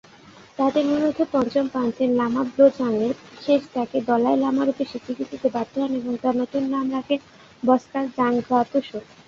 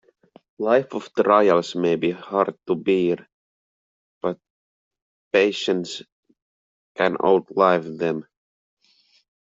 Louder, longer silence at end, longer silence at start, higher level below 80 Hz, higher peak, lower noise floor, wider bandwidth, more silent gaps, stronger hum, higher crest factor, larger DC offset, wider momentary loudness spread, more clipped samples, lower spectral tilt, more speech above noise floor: about the same, -22 LUFS vs -21 LUFS; second, 0.25 s vs 1.2 s; about the same, 0.6 s vs 0.6 s; first, -62 dBFS vs -68 dBFS; about the same, -4 dBFS vs -2 dBFS; second, -48 dBFS vs -61 dBFS; about the same, 7.4 kHz vs 7.8 kHz; second, none vs 3.33-4.21 s, 4.50-4.91 s, 5.02-5.31 s, 6.12-6.23 s, 6.42-6.95 s; neither; about the same, 18 dB vs 20 dB; neither; second, 8 LU vs 12 LU; neither; about the same, -6.5 dB/octave vs -5.5 dB/octave; second, 26 dB vs 41 dB